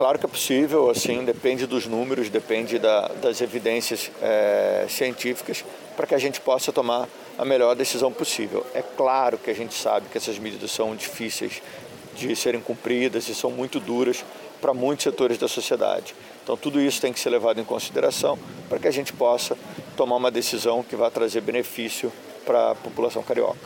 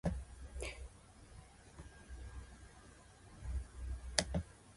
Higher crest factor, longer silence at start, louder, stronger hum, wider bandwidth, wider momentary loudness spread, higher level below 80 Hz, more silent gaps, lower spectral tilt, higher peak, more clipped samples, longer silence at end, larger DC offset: second, 16 dB vs 38 dB; about the same, 0 s vs 0.05 s; first, -24 LUFS vs -44 LUFS; neither; first, 17 kHz vs 11.5 kHz; second, 9 LU vs 22 LU; second, -68 dBFS vs -50 dBFS; neither; about the same, -3 dB/octave vs -3.5 dB/octave; about the same, -8 dBFS vs -8 dBFS; neither; about the same, 0 s vs 0 s; neither